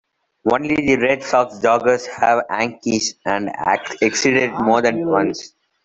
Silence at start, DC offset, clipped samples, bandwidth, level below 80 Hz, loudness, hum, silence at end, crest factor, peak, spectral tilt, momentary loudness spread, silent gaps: 0.45 s; under 0.1%; under 0.1%; 8.2 kHz; -54 dBFS; -18 LUFS; none; 0.4 s; 16 dB; -2 dBFS; -4 dB/octave; 6 LU; none